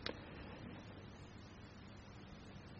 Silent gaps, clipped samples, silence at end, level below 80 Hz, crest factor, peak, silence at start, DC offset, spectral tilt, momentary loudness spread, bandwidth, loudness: none; under 0.1%; 0 s; -64 dBFS; 30 dB; -24 dBFS; 0 s; under 0.1%; -4 dB/octave; 4 LU; 7.4 kHz; -54 LUFS